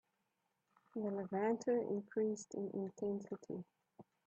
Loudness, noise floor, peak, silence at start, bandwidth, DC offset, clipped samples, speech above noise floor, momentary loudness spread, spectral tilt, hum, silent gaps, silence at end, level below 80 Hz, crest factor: -41 LUFS; -85 dBFS; -26 dBFS; 0.95 s; 8.6 kHz; under 0.1%; under 0.1%; 45 dB; 12 LU; -7 dB/octave; none; none; 0.25 s; -88 dBFS; 18 dB